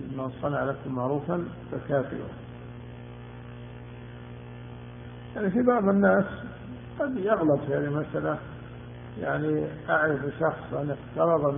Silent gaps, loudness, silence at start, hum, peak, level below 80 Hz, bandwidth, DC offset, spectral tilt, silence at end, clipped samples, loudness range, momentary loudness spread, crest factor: none; -27 LUFS; 0 s; 60 Hz at -45 dBFS; -10 dBFS; -54 dBFS; 3.7 kHz; under 0.1%; -7 dB/octave; 0 s; under 0.1%; 10 LU; 19 LU; 18 dB